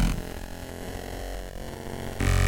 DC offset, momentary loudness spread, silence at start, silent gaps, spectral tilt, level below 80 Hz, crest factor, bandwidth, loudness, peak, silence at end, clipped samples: under 0.1%; 9 LU; 0 s; none; -5.5 dB/octave; -32 dBFS; 16 dB; 17 kHz; -34 LUFS; -12 dBFS; 0 s; under 0.1%